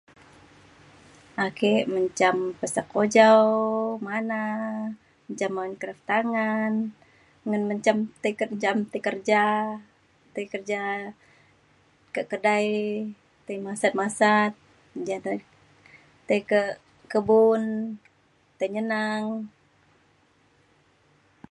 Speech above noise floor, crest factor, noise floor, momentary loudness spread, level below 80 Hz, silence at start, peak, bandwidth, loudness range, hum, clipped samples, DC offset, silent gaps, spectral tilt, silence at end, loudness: 39 dB; 22 dB; -63 dBFS; 16 LU; -70 dBFS; 1.35 s; -4 dBFS; 11.5 kHz; 7 LU; none; under 0.1%; under 0.1%; none; -5 dB/octave; 2.05 s; -25 LUFS